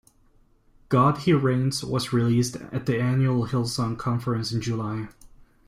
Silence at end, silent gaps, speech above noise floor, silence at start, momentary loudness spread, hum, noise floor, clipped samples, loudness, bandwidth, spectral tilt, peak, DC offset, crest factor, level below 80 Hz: 0.55 s; none; 36 dB; 0.9 s; 8 LU; none; -59 dBFS; under 0.1%; -24 LUFS; 15 kHz; -6.5 dB/octave; -8 dBFS; under 0.1%; 16 dB; -52 dBFS